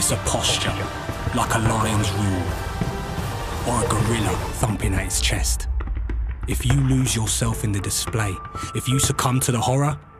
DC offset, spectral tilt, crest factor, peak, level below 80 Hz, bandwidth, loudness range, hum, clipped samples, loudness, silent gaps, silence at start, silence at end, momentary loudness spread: under 0.1%; -4 dB/octave; 20 dB; -2 dBFS; -30 dBFS; 15.5 kHz; 2 LU; none; under 0.1%; -22 LUFS; none; 0 s; 0 s; 8 LU